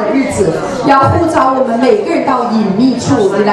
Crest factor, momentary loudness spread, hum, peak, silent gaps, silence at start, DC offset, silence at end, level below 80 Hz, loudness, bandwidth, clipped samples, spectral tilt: 10 dB; 4 LU; none; 0 dBFS; none; 0 s; under 0.1%; 0 s; -42 dBFS; -11 LUFS; 12 kHz; 0.2%; -6 dB/octave